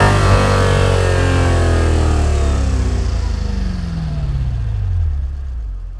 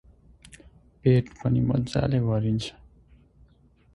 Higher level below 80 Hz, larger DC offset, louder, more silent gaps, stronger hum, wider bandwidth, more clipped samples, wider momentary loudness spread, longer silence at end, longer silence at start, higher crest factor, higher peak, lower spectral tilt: first, -20 dBFS vs -46 dBFS; neither; first, -17 LUFS vs -25 LUFS; neither; neither; about the same, 12 kHz vs 11 kHz; neither; first, 9 LU vs 6 LU; second, 0 s vs 1.25 s; second, 0 s vs 1.05 s; about the same, 14 dB vs 18 dB; first, 0 dBFS vs -8 dBFS; second, -6 dB/octave vs -8 dB/octave